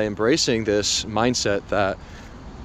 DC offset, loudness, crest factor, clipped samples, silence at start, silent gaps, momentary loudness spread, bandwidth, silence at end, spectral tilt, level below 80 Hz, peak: under 0.1%; -21 LUFS; 16 dB; under 0.1%; 0 s; none; 20 LU; 14 kHz; 0 s; -3.5 dB/octave; -44 dBFS; -6 dBFS